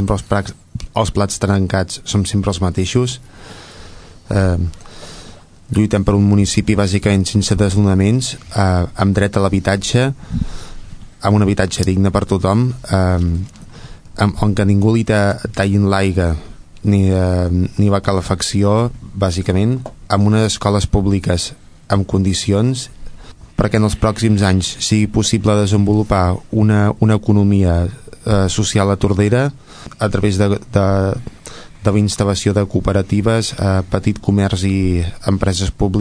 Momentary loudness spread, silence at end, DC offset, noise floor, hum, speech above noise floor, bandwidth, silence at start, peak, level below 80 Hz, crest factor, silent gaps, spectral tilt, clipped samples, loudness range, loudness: 9 LU; 0 s; under 0.1%; -38 dBFS; none; 23 dB; 11 kHz; 0 s; 0 dBFS; -32 dBFS; 14 dB; none; -6 dB/octave; under 0.1%; 3 LU; -16 LUFS